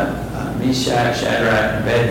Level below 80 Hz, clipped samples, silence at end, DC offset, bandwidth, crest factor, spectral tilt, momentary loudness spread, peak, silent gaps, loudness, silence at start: -36 dBFS; under 0.1%; 0 s; under 0.1%; 17 kHz; 10 dB; -5 dB/octave; 7 LU; -8 dBFS; none; -18 LUFS; 0 s